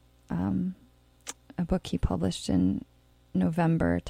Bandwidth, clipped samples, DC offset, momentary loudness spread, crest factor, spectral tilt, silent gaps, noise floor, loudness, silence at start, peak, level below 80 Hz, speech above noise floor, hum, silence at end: 13 kHz; under 0.1%; under 0.1%; 16 LU; 18 dB; -7 dB/octave; none; -47 dBFS; -29 LUFS; 0.3 s; -12 dBFS; -42 dBFS; 20 dB; none; 0 s